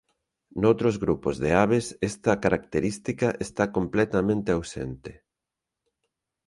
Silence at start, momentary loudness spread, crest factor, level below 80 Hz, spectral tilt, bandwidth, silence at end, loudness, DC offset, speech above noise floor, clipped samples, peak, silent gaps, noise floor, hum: 0.55 s; 13 LU; 20 dB; -50 dBFS; -6.5 dB/octave; 11.5 kHz; 1.35 s; -25 LUFS; under 0.1%; 62 dB; under 0.1%; -6 dBFS; none; -87 dBFS; none